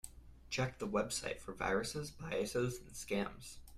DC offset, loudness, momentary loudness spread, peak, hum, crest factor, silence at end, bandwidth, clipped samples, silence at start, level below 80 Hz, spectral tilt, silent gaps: under 0.1%; -39 LUFS; 8 LU; -22 dBFS; none; 18 dB; 0 s; 15.5 kHz; under 0.1%; 0.05 s; -58 dBFS; -4 dB/octave; none